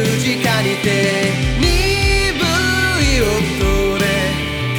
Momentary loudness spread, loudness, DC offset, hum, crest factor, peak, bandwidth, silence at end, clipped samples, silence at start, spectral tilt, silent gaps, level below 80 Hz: 2 LU; -15 LUFS; under 0.1%; none; 14 dB; -2 dBFS; over 20 kHz; 0 s; under 0.1%; 0 s; -4.5 dB/octave; none; -24 dBFS